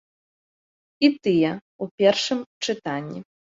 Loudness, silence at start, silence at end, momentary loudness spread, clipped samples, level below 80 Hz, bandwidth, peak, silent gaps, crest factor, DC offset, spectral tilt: -23 LUFS; 1 s; 0.4 s; 15 LU; under 0.1%; -66 dBFS; 7.8 kHz; -4 dBFS; 1.61-1.79 s, 1.91-1.98 s, 2.46-2.61 s; 20 dB; under 0.1%; -5 dB/octave